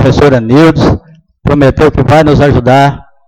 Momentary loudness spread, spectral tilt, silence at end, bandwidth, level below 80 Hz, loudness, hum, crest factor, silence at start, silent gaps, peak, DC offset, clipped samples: 6 LU; -7.5 dB/octave; 0.25 s; 12 kHz; -24 dBFS; -7 LUFS; none; 6 dB; 0 s; none; 0 dBFS; under 0.1%; 0.5%